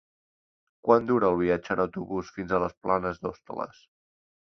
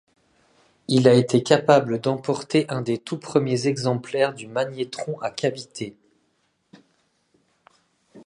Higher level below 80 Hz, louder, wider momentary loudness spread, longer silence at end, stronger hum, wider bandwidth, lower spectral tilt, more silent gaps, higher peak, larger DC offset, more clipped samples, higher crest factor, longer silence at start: first, -56 dBFS vs -68 dBFS; second, -27 LUFS vs -22 LUFS; about the same, 14 LU vs 13 LU; first, 0.9 s vs 0.1 s; neither; second, 6.4 kHz vs 11 kHz; first, -8 dB/octave vs -6 dB/octave; first, 2.77-2.81 s vs none; second, -6 dBFS vs 0 dBFS; neither; neither; about the same, 24 dB vs 22 dB; about the same, 0.85 s vs 0.9 s